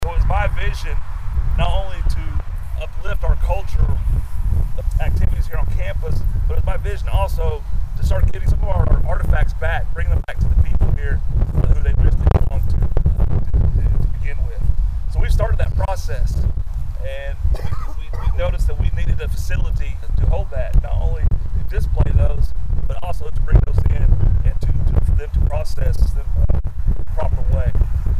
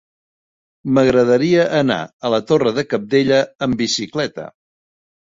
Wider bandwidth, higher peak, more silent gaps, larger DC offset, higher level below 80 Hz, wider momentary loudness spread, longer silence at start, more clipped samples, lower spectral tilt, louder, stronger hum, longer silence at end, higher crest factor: first, 9.6 kHz vs 8 kHz; about the same, 0 dBFS vs -2 dBFS; second, none vs 2.13-2.19 s; neither; first, -18 dBFS vs -54 dBFS; second, 7 LU vs 10 LU; second, 0 s vs 0.85 s; neither; first, -7.5 dB/octave vs -5 dB/octave; second, -21 LUFS vs -17 LUFS; neither; second, 0 s vs 0.75 s; about the same, 14 dB vs 16 dB